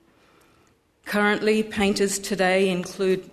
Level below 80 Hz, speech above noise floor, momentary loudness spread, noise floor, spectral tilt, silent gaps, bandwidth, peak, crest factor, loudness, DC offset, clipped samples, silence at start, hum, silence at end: -56 dBFS; 39 dB; 5 LU; -61 dBFS; -4 dB/octave; none; 13.5 kHz; -8 dBFS; 16 dB; -23 LUFS; under 0.1%; under 0.1%; 1.05 s; none; 0.05 s